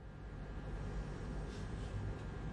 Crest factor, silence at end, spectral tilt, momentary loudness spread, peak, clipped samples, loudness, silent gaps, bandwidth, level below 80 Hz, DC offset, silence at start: 12 dB; 0 s; -7 dB/octave; 5 LU; -32 dBFS; under 0.1%; -46 LUFS; none; 10.5 kHz; -48 dBFS; under 0.1%; 0 s